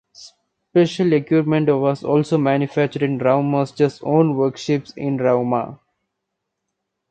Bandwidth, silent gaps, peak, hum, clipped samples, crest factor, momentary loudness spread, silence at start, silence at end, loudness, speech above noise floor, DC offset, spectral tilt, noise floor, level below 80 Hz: 9 kHz; none; -2 dBFS; none; under 0.1%; 18 dB; 6 LU; 0.2 s; 1.35 s; -19 LUFS; 60 dB; under 0.1%; -7.5 dB/octave; -78 dBFS; -64 dBFS